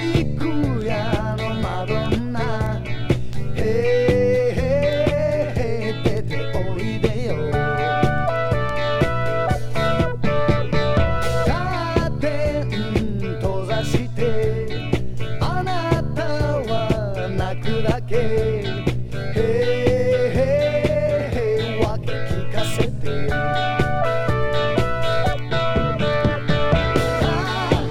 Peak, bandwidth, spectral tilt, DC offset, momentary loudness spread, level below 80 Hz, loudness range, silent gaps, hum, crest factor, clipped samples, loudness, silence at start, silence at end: -2 dBFS; 13.5 kHz; -6.5 dB/octave; under 0.1%; 6 LU; -32 dBFS; 3 LU; none; none; 18 dB; under 0.1%; -21 LUFS; 0 s; 0 s